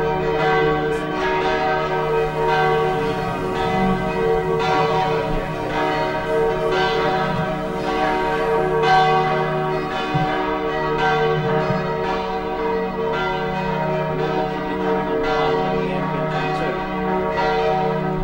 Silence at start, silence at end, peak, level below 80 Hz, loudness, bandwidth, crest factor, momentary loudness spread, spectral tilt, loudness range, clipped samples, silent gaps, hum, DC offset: 0 s; 0 s; -6 dBFS; -38 dBFS; -20 LUFS; 16 kHz; 14 dB; 5 LU; -6.5 dB/octave; 2 LU; under 0.1%; none; none; under 0.1%